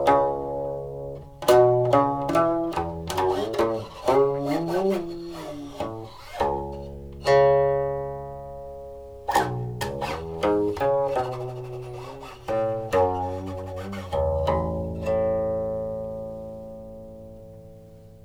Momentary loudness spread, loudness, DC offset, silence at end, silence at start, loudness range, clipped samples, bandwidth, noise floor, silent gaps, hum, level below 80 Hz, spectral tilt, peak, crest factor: 18 LU; -25 LUFS; under 0.1%; 0.05 s; 0 s; 5 LU; under 0.1%; over 20 kHz; -46 dBFS; none; none; -44 dBFS; -6.5 dB/octave; -6 dBFS; 20 dB